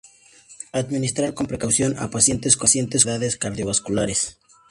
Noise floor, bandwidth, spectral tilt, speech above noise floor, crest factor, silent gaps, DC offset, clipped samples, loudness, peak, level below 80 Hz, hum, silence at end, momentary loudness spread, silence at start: -50 dBFS; 11.5 kHz; -3.5 dB/octave; 28 dB; 22 dB; none; under 0.1%; under 0.1%; -20 LUFS; -2 dBFS; -48 dBFS; none; 0.4 s; 11 LU; 0.5 s